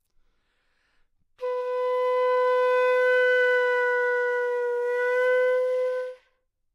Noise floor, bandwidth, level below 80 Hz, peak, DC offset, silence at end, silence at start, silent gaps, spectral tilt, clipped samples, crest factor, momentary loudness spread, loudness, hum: -71 dBFS; 7.2 kHz; -74 dBFS; -12 dBFS; under 0.1%; 0.6 s; 1.4 s; none; 0 dB/octave; under 0.1%; 12 dB; 9 LU; -24 LUFS; none